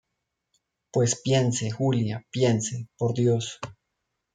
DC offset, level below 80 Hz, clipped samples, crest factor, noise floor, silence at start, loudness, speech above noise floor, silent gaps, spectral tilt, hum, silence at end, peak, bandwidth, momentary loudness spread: under 0.1%; -64 dBFS; under 0.1%; 18 dB; -81 dBFS; 0.95 s; -26 LUFS; 57 dB; none; -5.5 dB/octave; none; 0.6 s; -8 dBFS; 9.6 kHz; 9 LU